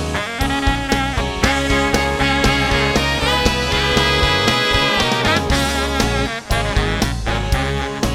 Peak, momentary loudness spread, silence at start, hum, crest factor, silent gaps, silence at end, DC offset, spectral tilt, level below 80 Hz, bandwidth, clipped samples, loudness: -2 dBFS; 6 LU; 0 s; none; 16 dB; none; 0 s; under 0.1%; -4 dB/octave; -24 dBFS; 17 kHz; under 0.1%; -17 LUFS